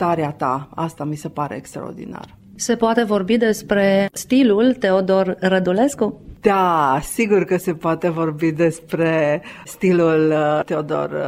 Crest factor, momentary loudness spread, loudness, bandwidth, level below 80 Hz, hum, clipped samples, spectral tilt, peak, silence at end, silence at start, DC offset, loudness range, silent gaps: 16 dB; 11 LU; -18 LUFS; 16 kHz; -50 dBFS; none; under 0.1%; -6 dB/octave; -2 dBFS; 0 s; 0 s; under 0.1%; 4 LU; none